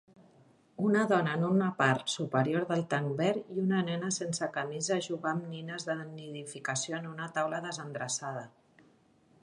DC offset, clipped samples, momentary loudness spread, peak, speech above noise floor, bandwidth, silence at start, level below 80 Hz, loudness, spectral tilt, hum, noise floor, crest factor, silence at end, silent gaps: under 0.1%; under 0.1%; 11 LU; -10 dBFS; 33 dB; 11.5 kHz; 0.8 s; -78 dBFS; -32 LUFS; -4.5 dB/octave; none; -65 dBFS; 22 dB; 0.95 s; none